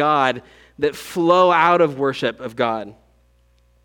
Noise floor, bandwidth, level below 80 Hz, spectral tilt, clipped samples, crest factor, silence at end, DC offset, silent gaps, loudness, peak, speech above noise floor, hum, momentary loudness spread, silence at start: -57 dBFS; 18 kHz; -58 dBFS; -5.5 dB/octave; under 0.1%; 18 dB; 0.9 s; under 0.1%; none; -18 LUFS; -2 dBFS; 39 dB; 60 Hz at -50 dBFS; 12 LU; 0 s